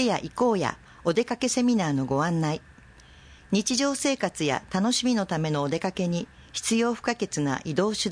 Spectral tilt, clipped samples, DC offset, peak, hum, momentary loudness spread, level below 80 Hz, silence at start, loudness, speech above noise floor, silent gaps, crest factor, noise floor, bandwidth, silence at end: -4.5 dB/octave; under 0.1%; under 0.1%; -10 dBFS; none; 6 LU; -56 dBFS; 0 s; -26 LUFS; 26 dB; none; 16 dB; -51 dBFS; 10.5 kHz; 0 s